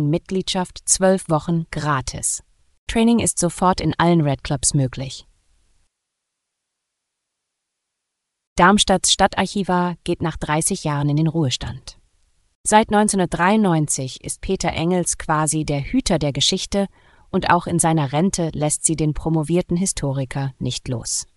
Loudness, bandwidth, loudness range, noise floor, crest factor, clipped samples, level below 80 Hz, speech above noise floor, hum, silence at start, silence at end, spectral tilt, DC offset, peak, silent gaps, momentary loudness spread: -19 LUFS; 13.5 kHz; 4 LU; -80 dBFS; 20 dB; under 0.1%; -40 dBFS; 60 dB; none; 0 s; 0.1 s; -4 dB/octave; under 0.1%; 0 dBFS; 2.78-2.87 s, 8.47-8.56 s, 12.55-12.64 s; 9 LU